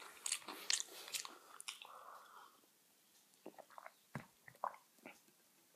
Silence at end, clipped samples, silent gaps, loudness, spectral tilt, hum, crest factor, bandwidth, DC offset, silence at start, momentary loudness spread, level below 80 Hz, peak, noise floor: 0 s; under 0.1%; none; -45 LUFS; 0 dB/octave; none; 32 dB; 15.5 kHz; under 0.1%; 0 s; 22 LU; under -90 dBFS; -18 dBFS; -73 dBFS